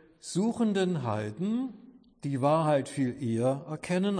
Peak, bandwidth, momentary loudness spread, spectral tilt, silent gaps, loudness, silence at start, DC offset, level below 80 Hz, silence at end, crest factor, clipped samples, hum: -14 dBFS; 10.5 kHz; 9 LU; -6.5 dB/octave; none; -30 LUFS; 0.25 s; under 0.1%; -68 dBFS; 0 s; 16 dB; under 0.1%; none